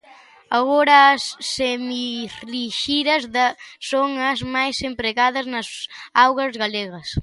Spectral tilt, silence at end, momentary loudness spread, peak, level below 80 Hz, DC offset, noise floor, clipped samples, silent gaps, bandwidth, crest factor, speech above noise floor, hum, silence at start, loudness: -3.5 dB/octave; 0 s; 13 LU; -2 dBFS; -48 dBFS; under 0.1%; -48 dBFS; under 0.1%; none; 11.5 kHz; 18 dB; 28 dB; none; 0.5 s; -19 LUFS